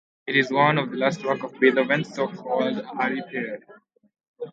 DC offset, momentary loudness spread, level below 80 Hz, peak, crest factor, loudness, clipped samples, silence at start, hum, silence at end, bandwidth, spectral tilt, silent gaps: under 0.1%; 11 LU; -72 dBFS; -4 dBFS; 20 dB; -23 LUFS; under 0.1%; 0.25 s; none; 0 s; 7.8 kHz; -6 dB/octave; 4.28-4.34 s